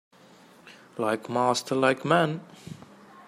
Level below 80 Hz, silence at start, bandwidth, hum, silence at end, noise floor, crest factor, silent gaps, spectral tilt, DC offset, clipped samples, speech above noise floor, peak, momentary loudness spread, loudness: -72 dBFS; 0.65 s; 15.5 kHz; none; 0.05 s; -54 dBFS; 22 dB; none; -5 dB/octave; under 0.1%; under 0.1%; 28 dB; -8 dBFS; 21 LU; -25 LUFS